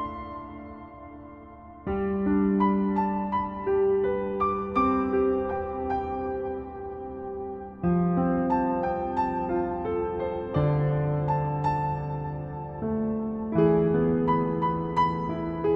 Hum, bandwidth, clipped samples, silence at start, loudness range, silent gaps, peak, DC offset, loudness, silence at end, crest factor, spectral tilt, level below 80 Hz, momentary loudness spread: none; 6.4 kHz; under 0.1%; 0 s; 3 LU; none; -10 dBFS; under 0.1%; -27 LUFS; 0 s; 16 dB; -10.5 dB/octave; -46 dBFS; 13 LU